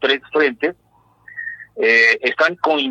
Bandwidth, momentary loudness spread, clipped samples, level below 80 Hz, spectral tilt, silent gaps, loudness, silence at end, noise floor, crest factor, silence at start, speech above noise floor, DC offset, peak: 8.8 kHz; 18 LU; under 0.1%; -66 dBFS; -3 dB/octave; none; -16 LUFS; 0 s; -56 dBFS; 16 dB; 0 s; 40 dB; under 0.1%; -2 dBFS